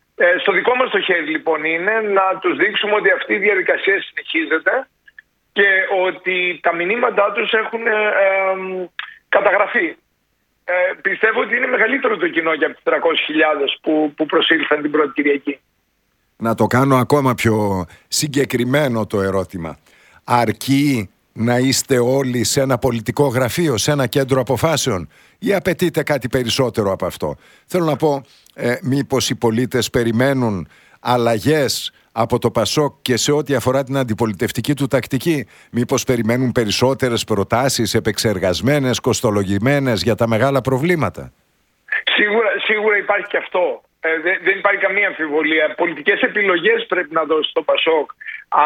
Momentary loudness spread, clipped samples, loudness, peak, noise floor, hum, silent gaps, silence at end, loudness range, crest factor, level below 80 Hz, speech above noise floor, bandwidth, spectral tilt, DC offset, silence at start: 7 LU; under 0.1%; -17 LUFS; 0 dBFS; -66 dBFS; none; none; 0 s; 3 LU; 18 dB; -50 dBFS; 49 dB; 18.5 kHz; -4.5 dB/octave; under 0.1%; 0.2 s